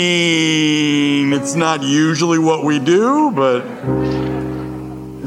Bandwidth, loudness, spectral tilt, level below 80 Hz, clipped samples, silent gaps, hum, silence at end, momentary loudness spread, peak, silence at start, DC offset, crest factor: 12.5 kHz; -15 LUFS; -4.5 dB/octave; -44 dBFS; under 0.1%; none; none; 0 s; 10 LU; -2 dBFS; 0 s; under 0.1%; 14 dB